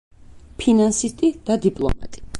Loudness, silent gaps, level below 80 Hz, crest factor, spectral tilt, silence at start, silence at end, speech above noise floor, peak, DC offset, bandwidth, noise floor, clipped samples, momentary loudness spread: -20 LUFS; none; -36 dBFS; 16 dB; -5 dB/octave; 0.3 s; 0 s; 19 dB; -6 dBFS; under 0.1%; 11.5 kHz; -38 dBFS; under 0.1%; 9 LU